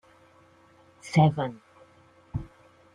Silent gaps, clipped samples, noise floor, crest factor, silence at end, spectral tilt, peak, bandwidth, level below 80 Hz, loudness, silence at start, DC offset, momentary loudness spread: none; under 0.1%; -58 dBFS; 22 dB; 0.5 s; -7.5 dB/octave; -8 dBFS; 10 kHz; -54 dBFS; -27 LUFS; 1.05 s; under 0.1%; 27 LU